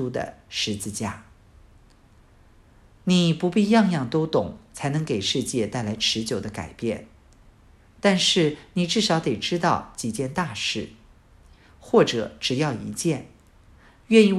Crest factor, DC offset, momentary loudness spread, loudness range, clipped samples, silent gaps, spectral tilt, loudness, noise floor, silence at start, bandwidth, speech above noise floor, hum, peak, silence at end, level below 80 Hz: 22 dB; under 0.1%; 12 LU; 4 LU; under 0.1%; none; -4.5 dB/octave; -24 LUFS; -54 dBFS; 0 s; 13.5 kHz; 31 dB; none; -4 dBFS; 0 s; -54 dBFS